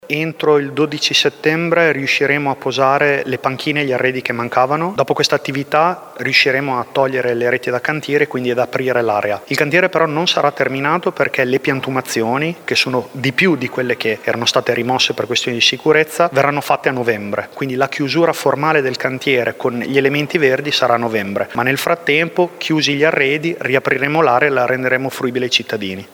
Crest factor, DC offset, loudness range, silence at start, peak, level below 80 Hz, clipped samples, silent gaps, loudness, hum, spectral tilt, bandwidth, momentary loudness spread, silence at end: 16 dB; under 0.1%; 2 LU; 0.05 s; 0 dBFS; -62 dBFS; under 0.1%; none; -16 LUFS; none; -4.5 dB/octave; over 20 kHz; 6 LU; 0.1 s